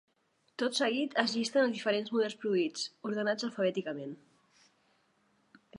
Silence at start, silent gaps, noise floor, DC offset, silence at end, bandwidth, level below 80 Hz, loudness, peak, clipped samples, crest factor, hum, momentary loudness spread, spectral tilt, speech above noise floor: 0.6 s; none; -74 dBFS; under 0.1%; 0 s; 11.5 kHz; -86 dBFS; -32 LUFS; -10 dBFS; under 0.1%; 24 dB; none; 11 LU; -4 dB/octave; 42 dB